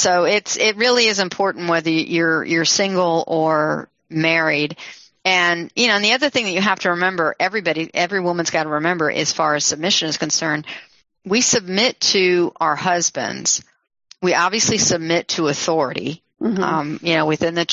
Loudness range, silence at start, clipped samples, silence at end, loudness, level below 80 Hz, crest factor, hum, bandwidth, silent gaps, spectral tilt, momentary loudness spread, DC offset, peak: 2 LU; 0 s; under 0.1%; 0 s; -18 LUFS; -60 dBFS; 18 dB; none; 8 kHz; none; -2.5 dB/octave; 7 LU; under 0.1%; 0 dBFS